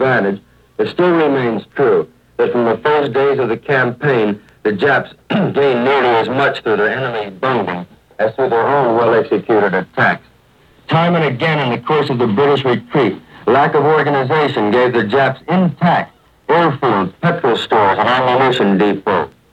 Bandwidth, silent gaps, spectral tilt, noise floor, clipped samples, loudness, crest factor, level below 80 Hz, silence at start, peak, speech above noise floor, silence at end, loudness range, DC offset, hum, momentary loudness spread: 8.4 kHz; none; -7.5 dB/octave; -49 dBFS; under 0.1%; -14 LUFS; 14 dB; -56 dBFS; 0 s; 0 dBFS; 35 dB; 0.25 s; 2 LU; under 0.1%; none; 7 LU